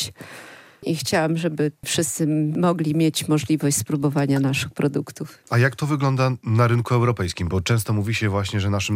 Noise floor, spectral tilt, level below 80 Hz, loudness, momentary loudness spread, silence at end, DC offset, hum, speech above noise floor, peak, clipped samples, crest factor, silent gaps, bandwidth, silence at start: -43 dBFS; -5.5 dB/octave; -56 dBFS; -22 LUFS; 7 LU; 0 s; under 0.1%; none; 22 dB; -6 dBFS; under 0.1%; 16 dB; none; 16 kHz; 0 s